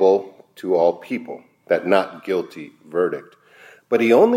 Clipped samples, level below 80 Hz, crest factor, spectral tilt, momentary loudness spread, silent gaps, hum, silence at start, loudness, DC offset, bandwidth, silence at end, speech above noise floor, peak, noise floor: under 0.1%; -74 dBFS; 18 dB; -6.5 dB/octave; 18 LU; none; none; 0 s; -21 LUFS; under 0.1%; 15.5 kHz; 0 s; 29 dB; -2 dBFS; -49 dBFS